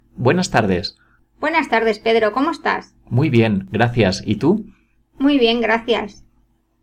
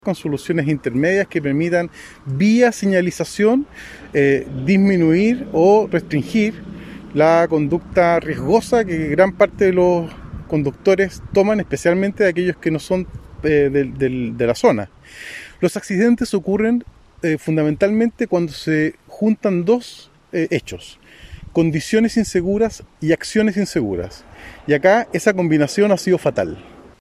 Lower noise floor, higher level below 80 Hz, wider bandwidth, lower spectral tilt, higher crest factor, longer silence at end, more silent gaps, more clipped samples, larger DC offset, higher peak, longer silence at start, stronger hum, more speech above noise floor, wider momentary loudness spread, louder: first, -60 dBFS vs -38 dBFS; about the same, -46 dBFS vs -44 dBFS; second, 10.5 kHz vs 14 kHz; about the same, -6 dB/octave vs -6.5 dB/octave; about the same, 16 dB vs 18 dB; first, 0.7 s vs 0.35 s; neither; neither; neither; about the same, -2 dBFS vs 0 dBFS; about the same, 0.15 s vs 0.05 s; neither; first, 43 dB vs 21 dB; second, 7 LU vs 11 LU; about the same, -18 LUFS vs -18 LUFS